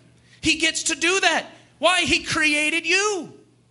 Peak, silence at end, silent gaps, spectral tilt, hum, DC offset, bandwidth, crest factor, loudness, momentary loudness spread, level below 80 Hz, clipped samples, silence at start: -2 dBFS; 0.35 s; none; -1.5 dB/octave; none; under 0.1%; 11.5 kHz; 20 dB; -19 LUFS; 7 LU; -52 dBFS; under 0.1%; 0.45 s